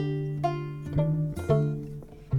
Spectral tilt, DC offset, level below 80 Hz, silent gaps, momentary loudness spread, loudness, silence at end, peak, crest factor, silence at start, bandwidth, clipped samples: -9 dB/octave; under 0.1%; -46 dBFS; none; 11 LU; -29 LUFS; 0 s; -10 dBFS; 18 dB; 0 s; 10.5 kHz; under 0.1%